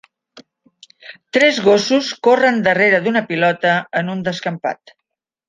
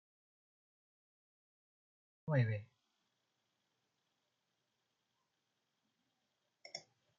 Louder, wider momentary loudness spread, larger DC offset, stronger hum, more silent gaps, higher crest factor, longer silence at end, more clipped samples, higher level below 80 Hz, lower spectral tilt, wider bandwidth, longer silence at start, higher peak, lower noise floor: first, -16 LUFS vs -38 LUFS; second, 10 LU vs 16 LU; neither; neither; neither; second, 16 dB vs 24 dB; first, 0.75 s vs 0.4 s; neither; first, -62 dBFS vs -82 dBFS; second, -4.5 dB/octave vs -6.5 dB/octave; first, 9.6 kHz vs 7 kHz; second, 0.35 s vs 2.25 s; first, 0 dBFS vs -22 dBFS; second, -79 dBFS vs -86 dBFS